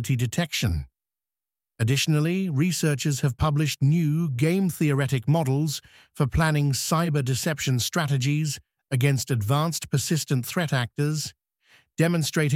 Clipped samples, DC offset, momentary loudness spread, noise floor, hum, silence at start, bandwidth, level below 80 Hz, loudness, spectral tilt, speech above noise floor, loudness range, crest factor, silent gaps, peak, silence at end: under 0.1%; under 0.1%; 6 LU; under -90 dBFS; none; 0 s; 16.5 kHz; -44 dBFS; -24 LUFS; -5 dB/octave; over 66 dB; 2 LU; 16 dB; none; -8 dBFS; 0 s